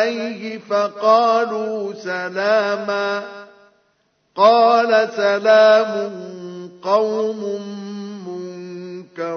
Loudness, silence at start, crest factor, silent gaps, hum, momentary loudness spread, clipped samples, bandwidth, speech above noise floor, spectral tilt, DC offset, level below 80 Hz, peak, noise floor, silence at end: -17 LUFS; 0 s; 18 dB; none; none; 19 LU; under 0.1%; 6.6 kHz; 47 dB; -4.5 dB/octave; under 0.1%; -78 dBFS; 0 dBFS; -64 dBFS; 0 s